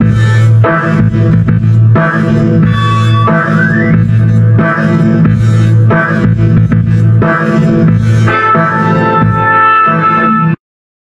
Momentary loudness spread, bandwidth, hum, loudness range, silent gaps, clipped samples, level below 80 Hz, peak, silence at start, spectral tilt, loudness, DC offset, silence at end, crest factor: 2 LU; 7.6 kHz; none; 1 LU; none; under 0.1%; -30 dBFS; 0 dBFS; 0 s; -8.5 dB/octave; -8 LUFS; under 0.1%; 0.45 s; 8 dB